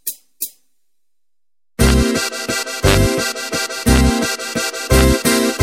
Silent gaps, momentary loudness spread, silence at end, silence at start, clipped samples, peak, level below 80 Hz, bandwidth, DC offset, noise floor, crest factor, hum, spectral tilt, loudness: none; 13 LU; 0 s; 0.05 s; under 0.1%; 0 dBFS; -22 dBFS; 17 kHz; under 0.1%; under -90 dBFS; 16 dB; none; -4 dB/octave; -16 LUFS